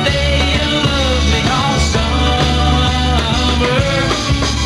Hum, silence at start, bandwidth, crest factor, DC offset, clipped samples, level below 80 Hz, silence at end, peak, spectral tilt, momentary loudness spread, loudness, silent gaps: none; 0 s; 11.5 kHz; 12 dB; under 0.1%; under 0.1%; -20 dBFS; 0 s; -2 dBFS; -4.5 dB/octave; 1 LU; -14 LUFS; none